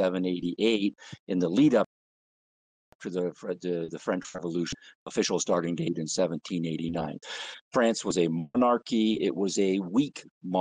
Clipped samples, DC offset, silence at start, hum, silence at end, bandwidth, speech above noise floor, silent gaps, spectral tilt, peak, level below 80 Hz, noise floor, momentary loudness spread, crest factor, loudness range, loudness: under 0.1%; under 0.1%; 0 s; none; 0 s; 10 kHz; over 62 dB; 1.19-1.27 s, 1.86-2.99 s, 4.95-5.06 s, 7.61-7.71 s, 10.31-10.41 s; -5 dB/octave; -12 dBFS; -66 dBFS; under -90 dBFS; 10 LU; 16 dB; 5 LU; -28 LUFS